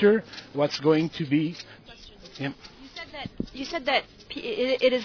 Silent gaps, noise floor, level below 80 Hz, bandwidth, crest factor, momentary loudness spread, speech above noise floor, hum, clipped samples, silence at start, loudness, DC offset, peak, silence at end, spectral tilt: none; -47 dBFS; -56 dBFS; 5.4 kHz; 20 dB; 21 LU; 21 dB; none; under 0.1%; 0 s; -27 LUFS; under 0.1%; -8 dBFS; 0 s; -6 dB/octave